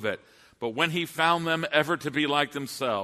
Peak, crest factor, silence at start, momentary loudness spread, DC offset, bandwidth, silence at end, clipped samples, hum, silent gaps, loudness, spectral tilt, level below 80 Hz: -6 dBFS; 20 dB; 0 s; 9 LU; under 0.1%; 13.5 kHz; 0 s; under 0.1%; none; none; -26 LUFS; -4.5 dB/octave; -68 dBFS